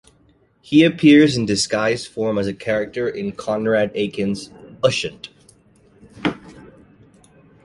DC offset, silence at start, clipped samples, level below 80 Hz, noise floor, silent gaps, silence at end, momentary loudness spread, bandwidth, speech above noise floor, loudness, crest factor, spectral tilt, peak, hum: under 0.1%; 0.7 s; under 0.1%; -52 dBFS; -57 dBFS; none; 1.05 s; 16 LU; 11.5 kHz; 39 dB; -19 LUFS; 18 dB; -5 dB/octave; -2 dBFS; none